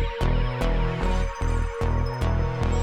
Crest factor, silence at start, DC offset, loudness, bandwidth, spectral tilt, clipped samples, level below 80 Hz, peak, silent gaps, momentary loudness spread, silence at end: 12 dB; 0 s; under 0.1%; -26 LUFS; 9.6 kHz; -6.5 dB/octave; under 0.1%; -26 dBFS; -10 dBFS; none; 2 LU; 0 s